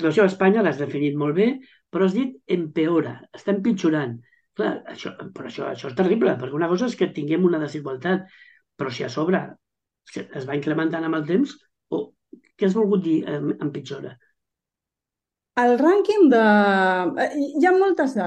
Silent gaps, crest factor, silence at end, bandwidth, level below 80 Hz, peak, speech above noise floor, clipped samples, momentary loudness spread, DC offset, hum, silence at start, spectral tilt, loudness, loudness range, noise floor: none; 18 dB; 0 s; 8.8 kHz; -70 dBFS; -4 dBFS; 66 dB; under 0.1%; 16 LU; under 0.1%; none; 0 s; -7 dB/octave; -22 LUFS; 7 LU; -87 dBFS